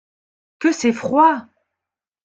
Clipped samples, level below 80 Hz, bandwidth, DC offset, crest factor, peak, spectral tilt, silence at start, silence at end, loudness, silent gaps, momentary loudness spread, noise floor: under 0.1%; -66 dBFS; 9 kHz; under 0.1%; 18 dB; -2 dBFS; -4.5 dB/octave; 0.6 s; 0.85 s; -18 LUFS; none; 7 LU; -86 dBFS